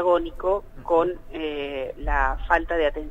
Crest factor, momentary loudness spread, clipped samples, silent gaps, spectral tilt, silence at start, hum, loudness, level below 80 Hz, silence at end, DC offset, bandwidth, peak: 18 dB; 8 LU; under 0.1%; none; -7 dB/octave; 0 s; none; -25 LUFS; -34 dBFS; 0 s; under 0.1%; 8 kHz; -6 dBFS